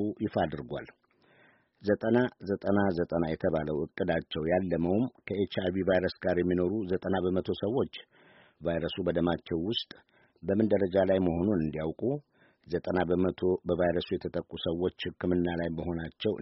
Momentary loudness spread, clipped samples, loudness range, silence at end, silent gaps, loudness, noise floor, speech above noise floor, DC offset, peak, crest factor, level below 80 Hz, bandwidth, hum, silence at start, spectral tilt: 8 LU; under 0.1%; 2 LU; 0 s; none; -30 LUFS; -64 dBFS; 34 dB; under 0.1%; -12 dBFS; 18 dB; -56 dBFS; 5.8 kHz; none; 0 s; -5.5 dB/octave